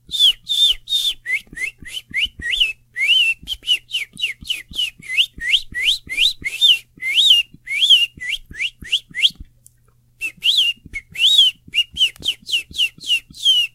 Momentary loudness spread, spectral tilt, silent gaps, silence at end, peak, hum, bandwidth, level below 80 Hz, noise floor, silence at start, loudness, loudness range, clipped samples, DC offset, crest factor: 13 LU; 1.5 dB/octave; none; 0.05 s; -2 dBFS; none; 16 kHz; -46 dBFS; -56 dBFS; 0.1 s; -16 LUFS; 4 LU; under 0.1%; under 0.1%; 18 dB